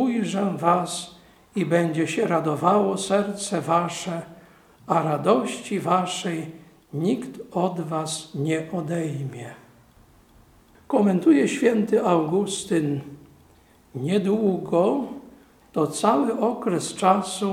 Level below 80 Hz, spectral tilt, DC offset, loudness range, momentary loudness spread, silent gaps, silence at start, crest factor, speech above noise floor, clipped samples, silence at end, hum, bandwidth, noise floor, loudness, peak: -64 dBFS; -5.5 dB/octave; under 0.1%; 6 LU; 12 LU; none; 0 s; 20 dB; 32 dB; under 0.1%; 0 s; none; 15.5 kHz; -55 dBFS; -23 LUFS; -4 dBFS